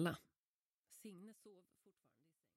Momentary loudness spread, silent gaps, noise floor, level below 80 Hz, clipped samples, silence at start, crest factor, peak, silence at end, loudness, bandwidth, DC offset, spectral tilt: 17 LU; 0.38-0.83 s; under -90 dBFS; -84 dBFS; under 0.1%; 0 s; 26 dB; -26 dBFS; 0.95 s; -52 LUFS; 16 kHz; under 0.1%; -6 dB/octave